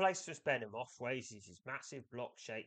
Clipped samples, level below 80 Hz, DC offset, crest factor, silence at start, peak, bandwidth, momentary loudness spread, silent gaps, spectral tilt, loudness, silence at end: under 0.1%; -84 dBFS; under 0.1%; 20 dB; 0 s; -22 dBFS; 9 kHz; 11 LU; none; -3.5 dB/octave; -42 LUFS; 0 s